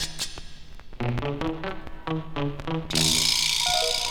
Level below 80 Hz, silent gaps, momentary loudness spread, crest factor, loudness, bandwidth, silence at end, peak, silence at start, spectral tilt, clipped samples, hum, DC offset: -42 dBFS; none; 14 LU; 18 dB; -25 LUFS; 19 kHz; 0 s; -8 dBFS; 0 s; -2.5 dB/octave; under 0.1%; none; 0.8%